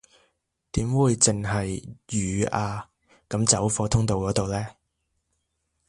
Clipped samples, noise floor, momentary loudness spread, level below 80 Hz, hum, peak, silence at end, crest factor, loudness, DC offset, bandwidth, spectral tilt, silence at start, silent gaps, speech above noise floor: under 0.1%; -76 dBFS; 12 LU; -44 dBFS; none; -4 dBFS; 1.15 s; 24 dB; -24 LUFS; under 0.1%; 11.5 kHz; -4.5 dB/octave; 0.75 s; none; 52 dB